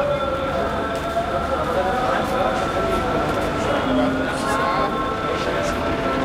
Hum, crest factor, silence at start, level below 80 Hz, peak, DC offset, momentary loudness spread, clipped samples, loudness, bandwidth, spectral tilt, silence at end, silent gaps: none; 14 dB; 0 s; -36 dBFS; -6 dBFS; under 0.1%; 3 LU; under 0.1%; -21 LUFS; 16 kHz; -5.5 dB/octave; 0 s; none